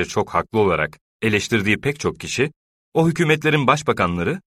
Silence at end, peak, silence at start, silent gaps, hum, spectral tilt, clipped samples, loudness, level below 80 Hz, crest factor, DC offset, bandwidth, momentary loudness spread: 0.1 s; -2 dBFS; 0 s; 1.01-1.20 s, 2.56-2.92 s; none; -5.5 dB/octave; under 0.1%; -20 LUFS; -48 dBFS; 18 dB; under 0.1%; 15 kHz; 8 LU